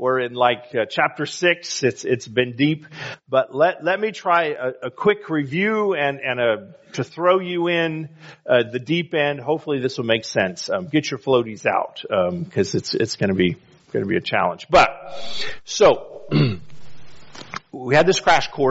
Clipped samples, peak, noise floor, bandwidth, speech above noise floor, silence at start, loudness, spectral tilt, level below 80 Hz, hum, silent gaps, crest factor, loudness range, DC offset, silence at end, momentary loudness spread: under 0.1%; -2 dBFS; -42 dBFS; 8 kHz; 21 dB; 0 s; -20 LUFS; -3.5 dB/octave; -54 dBFS; none; none; 18 dB; 2 LU; under 0.1%; 0 s; 12 LU